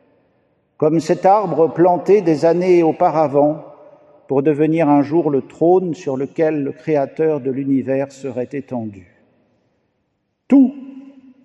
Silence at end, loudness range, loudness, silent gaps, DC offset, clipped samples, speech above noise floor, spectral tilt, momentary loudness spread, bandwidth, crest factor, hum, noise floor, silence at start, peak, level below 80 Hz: 0.45 s; 7 LU; -16 LUFS; none; under 0.1%; under 0.1%; 54 dB; -8 dB/octave; 12 LU; 9 kHz; 16 dB; none; -69 dBFS; 0.8 s; -2 dBFS; -68 dBFS